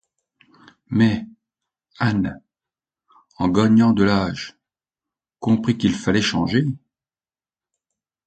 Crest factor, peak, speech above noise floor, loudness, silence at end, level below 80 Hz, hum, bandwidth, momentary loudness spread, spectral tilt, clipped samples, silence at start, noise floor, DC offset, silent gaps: 20 dB; -2 dBFS; over 72 dB; -20 LUFS; 1.5 s; -48 dBFS; none; 8.8 kHz; 13 LU; -6.5 dB/octave; under 0.1%; 0.9 s; under -90 dBFS; under 0.1%; none